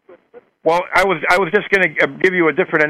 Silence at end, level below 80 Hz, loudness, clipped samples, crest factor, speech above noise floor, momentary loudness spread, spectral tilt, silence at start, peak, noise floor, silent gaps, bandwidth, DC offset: 0 s; -50 dBFS; -15 LUFS; under 0.1%; 16 dB; 31 dB; 3 LU; -5 dB/octave; 0.35 s; -2 dBFS; -46 dBFS; none; 15.5 kHz; under 0.1%